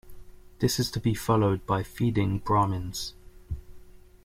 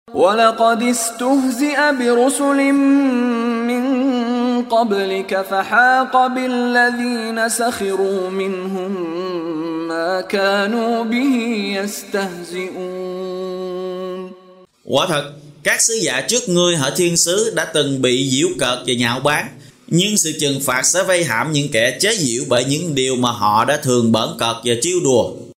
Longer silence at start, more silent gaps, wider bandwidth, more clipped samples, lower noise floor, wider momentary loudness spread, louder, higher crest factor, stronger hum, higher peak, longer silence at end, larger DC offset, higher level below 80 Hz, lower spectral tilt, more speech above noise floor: about the same, 0.05 s vs 0.1 s; neither; about the same, 16 kHz vs 16 kHz; neither; about the same, -48 dBFS vs -46 dBFS; first, 16 LU vs 9 LU; second, -27 LUFS vs -17 LUFS; about the same, 18 dB vs 18 dB; neither; second, -10 dBFS vs 0 dBFS; first, 0.25 s vs 0.1 s; neither; first, -46 dBFS vs -58 dBFS; first, -6 dB/octave vs -3.5 dB/octave; second, 22 dB vs 29 dB